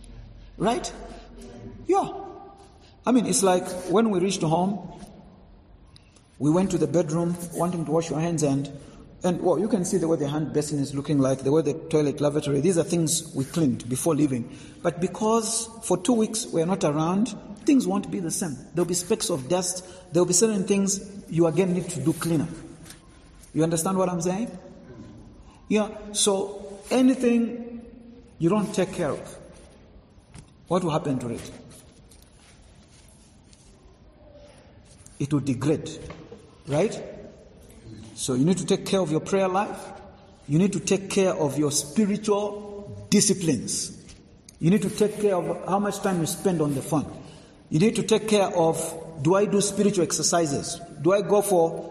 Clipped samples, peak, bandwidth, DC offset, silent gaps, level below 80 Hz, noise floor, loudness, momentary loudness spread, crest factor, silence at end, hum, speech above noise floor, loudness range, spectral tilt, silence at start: under 0.1%; -6 dBFS; 13 kHz; under 0.1%; none; -54 dBFS; -53 dBFS; -24 LUFS; 17 LU; 18 dB; 0 s; none; 29 dB; 6 LU; -5 dB/octave; 0 s